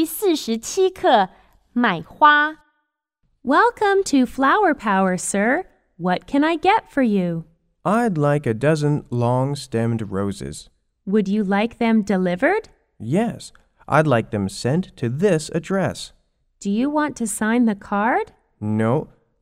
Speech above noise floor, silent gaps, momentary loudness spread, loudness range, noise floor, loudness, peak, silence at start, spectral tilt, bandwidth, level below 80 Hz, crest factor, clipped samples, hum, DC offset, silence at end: 54 dB; none; 10 LU; 4 LU; -74 dBFS; -20 LUFS; -2 dBFS; 0 s; -5.5 dB/octave; 16 kHz; -52 dBFS; 18 dB; under 0.1%; none; under 0.1%; 0.35 s